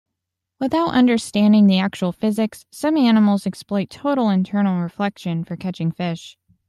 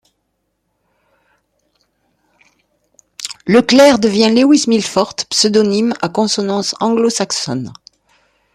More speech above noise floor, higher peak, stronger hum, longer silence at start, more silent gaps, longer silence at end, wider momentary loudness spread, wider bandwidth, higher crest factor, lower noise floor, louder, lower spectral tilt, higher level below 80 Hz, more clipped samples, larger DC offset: first, 63 dB vs 56 dB; second, -4 dBFS vs 0 dBFS; neither; second, 0.6 s vs 3.2 s; neither; second, 0.4 s vs 0.85 s; second, 11 LU vs 14 LU; second, 12.5 kHz vs 14.5 kHz; about the same, 16 dB vs 16 dB; first, -81 dBFS vs -68 dBFS; second, -19 LUFS vs -13 LUFS; first, -6.5 dB/octave vs -4 dB/octave; about the same, -60 dBFS vs -56 dBFS; neither; neither